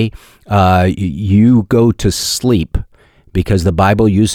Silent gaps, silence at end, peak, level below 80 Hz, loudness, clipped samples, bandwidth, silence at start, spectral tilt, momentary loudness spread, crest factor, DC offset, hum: none; 0 s; -2 dBFS; -28 dBFS; -13 LUFS; under 0.1%; 16 kHz; 0 s; -6 dB/octave; 10 LU; 10 dB; under 0.1%; none